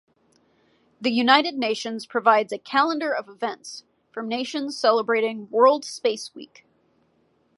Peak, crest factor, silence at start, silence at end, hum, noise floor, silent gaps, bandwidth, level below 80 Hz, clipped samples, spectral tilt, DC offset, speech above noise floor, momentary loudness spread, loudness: -2 dBFS; 22 dB; 1 s; 1.1 s; none; -65 dBFS; none; 11.5 kHz; -78 dBFS; under 0.1%; -3 dB/octave; under 0.1%; 43 dB; 17 LU; -22 LUFS